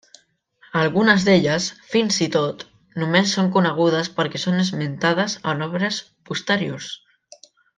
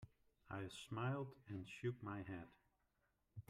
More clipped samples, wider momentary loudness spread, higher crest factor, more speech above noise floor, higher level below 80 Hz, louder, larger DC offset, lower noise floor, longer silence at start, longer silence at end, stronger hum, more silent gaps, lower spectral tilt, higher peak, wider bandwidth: neither; about the same, 12 LU vs 14 LU; about the same, 20 dB vs 18 dB; about the same, 37 dB vs 36 dB; first, -62 dBFS vs -78 dBFS; first, -20 LUFS vs -49 LUFS; neither; second, -56 dBFS vs -85 dBFS; first, 0.75 s vs 0 s; first, 0.8 s vs 0.1 s; neither; neither; second, -4.5 dB/octave vs -6.5 dB/octave; first, -2 dBFS vs -32 dBFS; second, 9.6 kHz vs 13 kHz